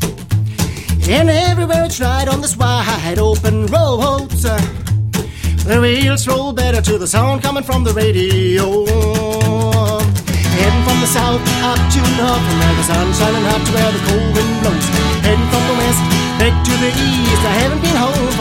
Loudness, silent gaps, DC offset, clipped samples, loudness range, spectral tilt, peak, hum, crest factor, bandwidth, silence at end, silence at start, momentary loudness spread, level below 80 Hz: -14 LUFS; none; under 0.1%; under 0.1%; 2 LU; -5 dB/octave; 0 dBFS; none; 14 dB; 16.5 kHz; 0 s; 0 s; 4 LU; -22 dBFS